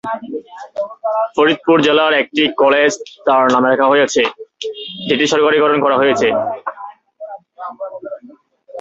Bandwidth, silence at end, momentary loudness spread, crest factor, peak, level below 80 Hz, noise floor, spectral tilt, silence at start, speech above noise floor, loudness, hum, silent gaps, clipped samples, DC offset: 8 kHz; 0 s; 19 LU; 14 dB; -2 dBFS; -58 dBFS; -44 dBFS; -3.5 dB/octave; 0.05 s; 30 dB; -14 LUFS; none; none; under 0.1%; under 0.1%